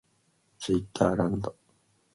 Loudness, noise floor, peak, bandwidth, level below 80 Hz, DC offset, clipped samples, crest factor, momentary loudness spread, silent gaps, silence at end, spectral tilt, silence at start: -29 LUFS; -70 dBFS; -8 dBFS; 11.5 kHz; -52 dBFS; under 0.1%; under 0.1%; 22 dB; 13 LU; none; 0.6 s; -6.5 dB/octave; 0.6 s